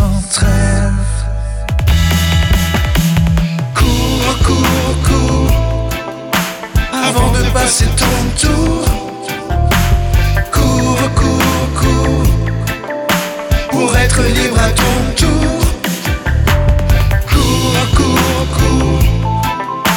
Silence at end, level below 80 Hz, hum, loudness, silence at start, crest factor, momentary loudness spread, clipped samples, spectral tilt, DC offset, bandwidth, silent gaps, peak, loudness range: 0 s; -16 dBFS; none; -13 LUFS; 0 s; 10 dB; 6 LU; under 0.1%; -5 dB/octave; under 0.1%; 19.5 kHz; none; 0 dBFS; 1 LU